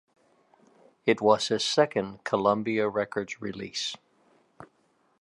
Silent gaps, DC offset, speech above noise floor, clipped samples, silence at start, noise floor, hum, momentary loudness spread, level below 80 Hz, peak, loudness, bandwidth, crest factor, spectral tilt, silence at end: none; under 0.1%; 42 dB; under 0.1%; 1.05 s; -68 dBFS; none; 11 LU; -68 dBFS; -6 dBFS; -27 LUFS; 11.5 kHz; 24 dB; -4 dB/octave; 0.55 s